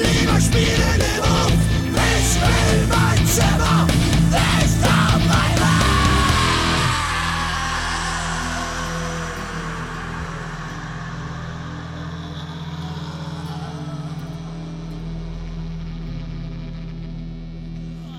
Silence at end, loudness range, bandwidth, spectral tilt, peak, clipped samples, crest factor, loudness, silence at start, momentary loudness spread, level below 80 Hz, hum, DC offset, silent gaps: 0 s; 14 LU; 17 kHz; -4.5 dB/octave; -6 dBFS; under 0.1%; 14 dB; -19 LUFS; 0 s; 15 LU; -28 dBFS; none; under 0.1%; none